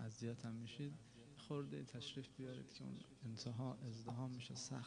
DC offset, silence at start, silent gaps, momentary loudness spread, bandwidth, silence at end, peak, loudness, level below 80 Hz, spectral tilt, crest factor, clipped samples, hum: under 0.1%; 0 s; none; 6 LU; 10 kHz; 0 s; -34 dBFS; -51 LUFS; -78 dBFS; -5.5 dB/octave; 16 dB; under 0.1%; none